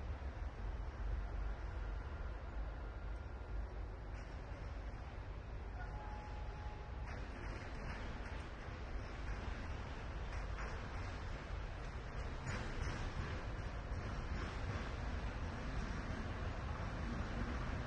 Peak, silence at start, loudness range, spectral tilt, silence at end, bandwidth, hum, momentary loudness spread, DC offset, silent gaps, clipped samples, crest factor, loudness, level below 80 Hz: -30 dBFS; 0 s; 4 LU; -6 dB/octave; 0 s; 9 kHz; none; 5 LU; under 0.1%; none; under 0.1%; 16 dB; -47 LUFS; -46 dBFS